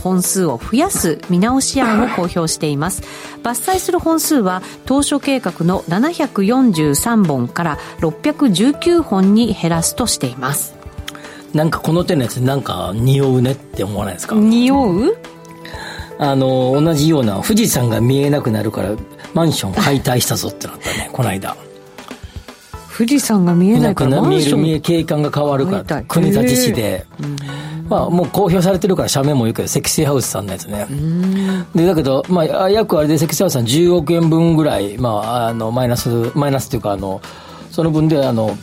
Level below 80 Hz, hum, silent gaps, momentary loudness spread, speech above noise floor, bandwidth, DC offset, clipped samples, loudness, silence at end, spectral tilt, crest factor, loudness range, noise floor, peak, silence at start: -40 dBFS; none; none; 12 LU; 20 dB; 16.5 kHz; under 0.1%; under 0.1%; -15 LUFS; 0 s; -5.5 dB/octave; 12 dB; 3 LU; -35 dBFS; -2 dBFS; 0 s